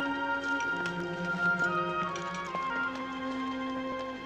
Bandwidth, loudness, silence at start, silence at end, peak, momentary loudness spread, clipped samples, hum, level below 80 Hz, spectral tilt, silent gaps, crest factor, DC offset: 9.4 kHz; -32 LUFS; 0 s; 0 s; -18 dBFS; 7 LU; under 0.1%; none; -62 dBFS; -5 dB/octave; none; 14 dB; under 0.1%